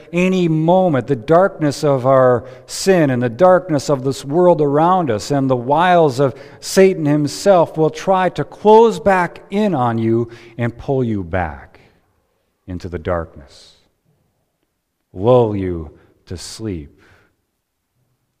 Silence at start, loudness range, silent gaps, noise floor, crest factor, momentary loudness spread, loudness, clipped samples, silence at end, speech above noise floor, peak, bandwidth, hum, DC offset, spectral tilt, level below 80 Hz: 0.1 s; 10 LU; none; -71 dBFS; 16 dB; 15 LU; -15 LUFS; under 0.1%; 1.55 s; 56 dB; 0 dBFS; 15.5 kHz; none; under 0.1%; -6.5 dB/octave; -46 dBFS